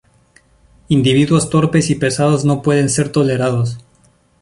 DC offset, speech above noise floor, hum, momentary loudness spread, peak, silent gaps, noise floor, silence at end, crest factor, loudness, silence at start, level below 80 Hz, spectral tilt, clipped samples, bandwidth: under 0.1%; 40 dB; none; 5 LU; -2 dBFS; none; -53 dBFS; 0.6 s; 14 dB; -15 LUFS; 0.9 s; -46 dBFS; -5.5 dB/octave; under 0.1%; 11.5 kHz